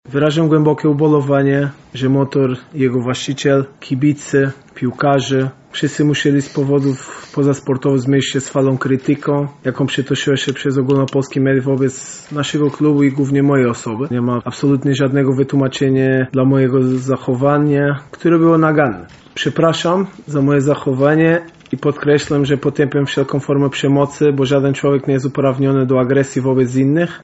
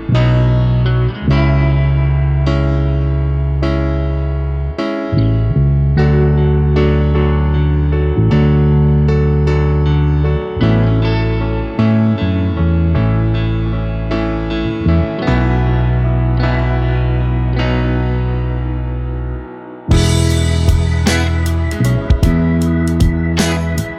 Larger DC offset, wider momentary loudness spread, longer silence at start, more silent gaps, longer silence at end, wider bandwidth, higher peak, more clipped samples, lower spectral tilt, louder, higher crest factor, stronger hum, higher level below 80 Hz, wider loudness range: neither; about the same, 7 LU vs 6 LU; about the same, 0.1 s vs 0 s; neither; about the same, 0.05 s vs 0 s; second, 8.2 kHz vs 13 kHz; about the same, 0 dBFS vs 0 dBFS; neither; about the same, -6.5 dB/octave vs -7 dB/octave; about the same, -15 LUFS vs -15 LUFS; about the same, 14 dB vs 14 dB; neither; second, -52 dBFS vs -18 dBFS; about the same, 2 LU vs 3 LU